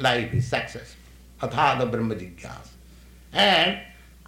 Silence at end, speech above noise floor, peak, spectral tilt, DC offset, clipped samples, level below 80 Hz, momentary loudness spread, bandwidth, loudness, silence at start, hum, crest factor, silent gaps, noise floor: 0.35 s; 24 dB; -6 dBFS; -4.5 dB/octave; under 0.1%; under 0.1%; -48 dBFS; 22 LU; 16.5 kHz; -23 LUFS; 0 s; none; 20 dB; none; -48 dBFS